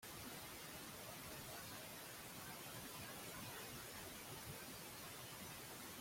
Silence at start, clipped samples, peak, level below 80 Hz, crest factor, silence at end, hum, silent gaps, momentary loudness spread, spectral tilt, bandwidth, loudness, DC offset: 0 s; under 0.1%; -40 dBFS; -72 dBFS; 14 dB; 0 s; none; none; 1 LU; -2.5 dB/octave; 16.5 kHz; -52 LUFS; under 0.1%